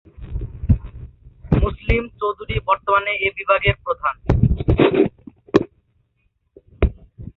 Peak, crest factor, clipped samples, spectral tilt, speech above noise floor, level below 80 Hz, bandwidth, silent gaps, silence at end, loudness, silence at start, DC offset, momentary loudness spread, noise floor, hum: 0 dBFS; 20 dB; under 0.1%; -8.5 dB/octave; 47 dB; -28 dBFS; 7 kHz; none; 0.05 s; -20 LUFS; 0.2 s; under 0.1%; 15 LU; -67 dBFS; none